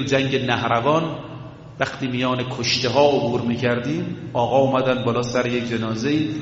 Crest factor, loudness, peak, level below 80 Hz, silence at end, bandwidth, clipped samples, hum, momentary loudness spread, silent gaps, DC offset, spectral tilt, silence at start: 18 dB; -21 LUFS; -2 dBFS; -54 dBFS; 0 s; 8 kHz; under 0.1%; none; 9 LU; none; under 0.1%; -4.5 dB/octave; 0 s